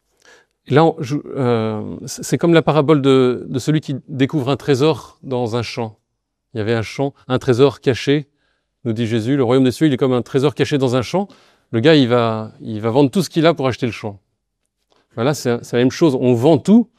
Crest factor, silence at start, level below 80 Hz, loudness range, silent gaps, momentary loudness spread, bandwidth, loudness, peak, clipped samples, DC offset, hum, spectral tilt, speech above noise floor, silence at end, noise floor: 16 dB; 0.7 s; -56 dBFS; 4 LU; none; 12 LU; 14.5 kHz; -17 LUFS; 0 dBFS; under 0.1%; under 0.1%; none; -6.5 dB/octave; 58 dB; 0.15 s; -74 dBFS